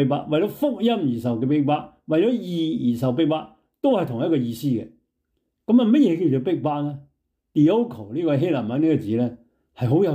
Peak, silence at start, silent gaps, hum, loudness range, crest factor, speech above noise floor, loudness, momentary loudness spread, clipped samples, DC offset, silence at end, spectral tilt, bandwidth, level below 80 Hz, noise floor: -8 dBFS; 0 s; none; none; 2 LU; 14 dB; 54 dB; -22 LUFS; 9 LU; under 0.1%; under 0.1%; 0 s; -8.5 dB/octave; 16 kHz; -64 dBFS; -75 dBFS